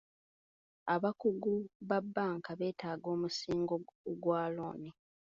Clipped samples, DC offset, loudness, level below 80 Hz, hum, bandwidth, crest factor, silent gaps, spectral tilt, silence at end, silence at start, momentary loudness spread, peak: under 0.1%; under 0.1%; -37 LUFS; -74 dBFS; none; 7.4 kHz; 18 dB; 1.75-1.80 s, 3.95-4.04 s; -5 dB/octave; 0.4 s; 0.85 s; 9 LU; -18 dBFS